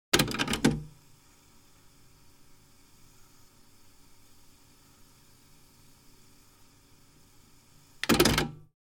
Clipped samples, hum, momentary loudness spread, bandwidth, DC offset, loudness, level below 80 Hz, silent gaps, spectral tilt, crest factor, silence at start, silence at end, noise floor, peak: under 0.1%; none; 15 LU; 17 kHz; under 0.1%; -27 LUFS; -50 dBFS; none; -3.5 dB/octave; 28 dB; 0.15 s; 0.3 s; -58 dBFS; -6 dBFS